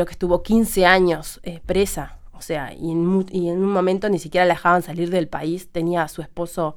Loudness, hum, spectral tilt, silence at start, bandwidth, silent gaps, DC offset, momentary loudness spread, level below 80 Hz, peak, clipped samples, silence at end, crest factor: -20 LUFS; none; -5.5 dB/octave; 0 s; 19.5 kHz; none; under 0.1%; 13 LU; -38 dBFS; 0 dBFS; under 0.1%; 0 s; 20 dB